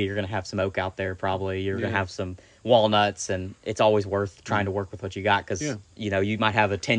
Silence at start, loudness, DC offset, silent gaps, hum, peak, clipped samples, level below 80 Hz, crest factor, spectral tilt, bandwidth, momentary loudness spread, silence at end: 0 s; -25 LUFS; under 0.1%; none; none; -4 dBFS; under 0.1%; -58 dBFS; 20 dB; -5 dB/octave; 10 kHz; 10 LU; 0 s